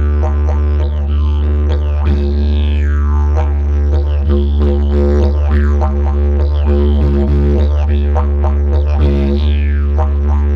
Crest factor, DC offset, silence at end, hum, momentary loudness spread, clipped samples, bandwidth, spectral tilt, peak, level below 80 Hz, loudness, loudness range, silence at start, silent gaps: 10 dB; under 0.1%; 0 s; none; 2 LU; under 0.1%; 4.5 kHz; -9.5 dB/octave; -2 dBFS; -12 dBFS; -14 LUFS; 1 LU; 0 s; none